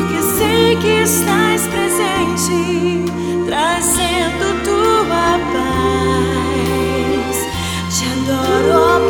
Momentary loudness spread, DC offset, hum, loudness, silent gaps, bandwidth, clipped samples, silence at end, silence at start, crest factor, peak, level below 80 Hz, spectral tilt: 5 LU; under 0.1%; none; -15 LUFS; none; over 20 kHz; under 0.1%; 0 s; 0 s; 14 dB; 0 dBFS; -34 dBFS; -4 dB/octave